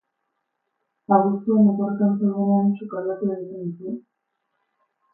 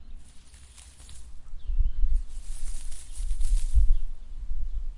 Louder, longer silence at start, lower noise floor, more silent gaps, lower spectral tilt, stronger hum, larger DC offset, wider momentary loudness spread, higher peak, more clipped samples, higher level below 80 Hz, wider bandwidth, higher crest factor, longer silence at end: first, -22 LUFS vs -34 LUFS; first, 1.1 s vs 0 s; first, -77 dBFS vs -48 dBFS; neither; first, -14.5 dB/octave vs -4 dB/octave; neither; neither; second, 14 LU vs 22 LU; first, -4 dBFS vs -8 dBFS; neither; second, -74 dBFS vs -28 dBFS; second, 2.8 kHz vs 11.5 kHz; about the same, 18 dB vs 16 dB; first, 1.15 s vs 0 s